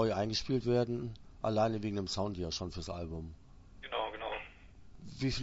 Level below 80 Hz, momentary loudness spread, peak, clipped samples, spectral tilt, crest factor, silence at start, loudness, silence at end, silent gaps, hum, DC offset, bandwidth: -54 dBFS; 16 LU; -18 dBFS; under 0.1%; -5 dB/octave; 18 dB; 0 s; -36 LUFS; 0 s; none; none; under 0.1%; 7.6 kHz